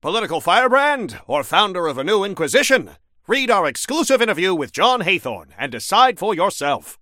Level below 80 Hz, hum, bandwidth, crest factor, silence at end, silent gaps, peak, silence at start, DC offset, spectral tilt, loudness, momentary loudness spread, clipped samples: -60 dBFS; none; 16.5 kHz; 18 dB; 0.05 s; none; 0 dBFS; 0.05 s; under 0.1%; -2.5 dB/octave; -18 LUFS; 8 LU; under 0.1%